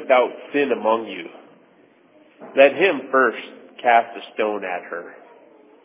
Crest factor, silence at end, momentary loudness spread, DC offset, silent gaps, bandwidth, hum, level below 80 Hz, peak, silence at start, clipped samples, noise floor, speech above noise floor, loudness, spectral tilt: 20 dB; 0.75 s; 18 LU; under 0.1%; none; 3.8 kHz; none; -86 dBFS; -2 dBFS; 0 s; under 0.1%; -54 dBFS; 35 dB; -20 LUFS; -7.5 dB/octave